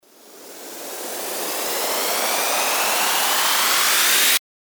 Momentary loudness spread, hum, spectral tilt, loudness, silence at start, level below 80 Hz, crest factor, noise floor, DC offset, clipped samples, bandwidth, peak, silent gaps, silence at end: 15 LU; none; 1.5 dB/octave; -18 LUFS; 0.3 s; -86 dBFS; 16 dB; -44 dBFS; under 0.1%; under 0.1%; over 20 kHz; -4 dBFS; none; 0.4 s